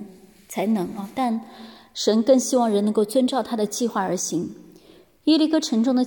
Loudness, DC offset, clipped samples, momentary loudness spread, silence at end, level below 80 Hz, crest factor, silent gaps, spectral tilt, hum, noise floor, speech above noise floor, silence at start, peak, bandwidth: -22 LUFS; under 0.1%; under 0.1%; 12 LU; 0 s; -66 dBFS; 16 dB; none; -4.5 dB/octave; none; -52 dBFS; 31 dB; 0 s; -6 dBFS; 17.5 kHz